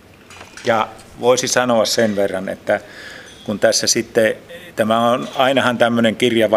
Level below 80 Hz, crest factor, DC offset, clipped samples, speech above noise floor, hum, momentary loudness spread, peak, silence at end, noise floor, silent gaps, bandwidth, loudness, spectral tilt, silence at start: -56 dBFS; 18 dB; under 0.1%; under 0.1%; 24 dB; none; 15 LU; 0 dBFS; 0 s; -40 dBFS; none; 15.5 kHz; -17 LUFS; -3 dB/octave; 0.3 s